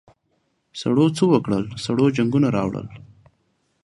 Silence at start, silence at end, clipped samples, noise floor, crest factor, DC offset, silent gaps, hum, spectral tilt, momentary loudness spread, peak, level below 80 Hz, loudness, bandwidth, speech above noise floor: 0.75 s; 0.85 s; under 0.1%; -69 dBFS; 18 dB; under 0.1%; none; none; -7 dB/octave; 13 LU; -4 dBFS; -54 dBFS; -20 LUFS; 11.5 kHz; 49 dB